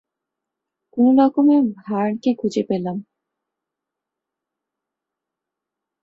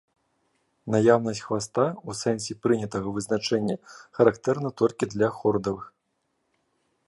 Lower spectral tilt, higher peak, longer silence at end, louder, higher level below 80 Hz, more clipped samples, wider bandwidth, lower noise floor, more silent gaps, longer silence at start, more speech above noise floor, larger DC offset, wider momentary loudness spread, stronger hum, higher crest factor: first, -7.5 dB/octave vs -5.5 dB/octave; about the same, -4 dBFS vs -4 dBFS; first, 3 s vs 1.2 s; first, -18 LUFS vs -25 LUFS; second, -68 dBFS vs -60 dBFS; neither; second, 7.6 kHz vs 11.5 kHz; first, -84 dBFS vs -75 dBFS; neither; about the same, 0.95 s vs 0.85 s; first, 67 dB vs 50 dB; neither; first, 13 LU vs 9 LU; neither; about the same, 18 dB vs 22 dB